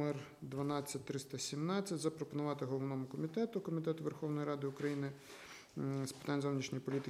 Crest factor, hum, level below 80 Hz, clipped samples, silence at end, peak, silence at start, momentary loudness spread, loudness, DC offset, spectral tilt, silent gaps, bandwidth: 16 dB; none; -78 dBFS; under 0.1%; 0 s; -24 dBFS; 0 s; 7 LU; -41 LUFS; under 0.1%; -6 dB/octave; none; 15.5 kHz